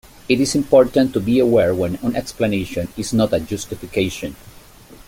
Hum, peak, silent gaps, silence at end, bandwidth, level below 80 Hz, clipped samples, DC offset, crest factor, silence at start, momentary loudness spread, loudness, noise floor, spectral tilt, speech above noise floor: none; -2 dBFS; none; 0.1 s; 17 kHz; -44 dBFS; under 0.1%; under 0.1%; 16 dB; 0.3 s; 12 LU; -18 LUFS; -43 dBFS; -5.5 dB/octave; 25 dB